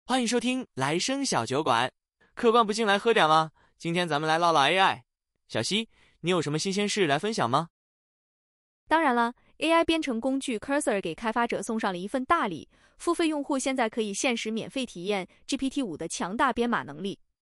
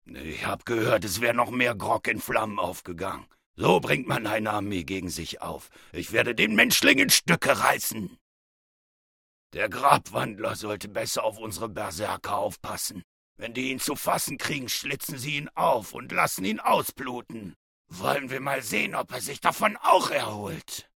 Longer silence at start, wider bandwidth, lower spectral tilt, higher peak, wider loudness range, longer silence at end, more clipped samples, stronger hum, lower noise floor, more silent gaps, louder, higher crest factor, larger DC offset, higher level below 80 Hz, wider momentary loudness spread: about the same, 0.05 s vs 0.1 s; second, 13.5 kHz vs 18 kHz; about the same, -4 dB/octave vs -3 dB/octave; second, -8 dBFS vs -2 dBFS; second, 5 LU vs 8 LU; first, 0.35 s vs 0.15 s; neither; neither; about the same, under -90 dBFS vs under -90 dBFS; second, 7.70-8.87 s vs 3.46-3.54 s, 8.21-9.50 s, 13.04-13.36 s, 17.56-17.85 s; about the same, -27 LUFS vs -26 LUFS; second, 20 dB vs 26 dB; neither; about the same, -60 dBFS vs -60 dBFS; second, 10 LU vs 14 LU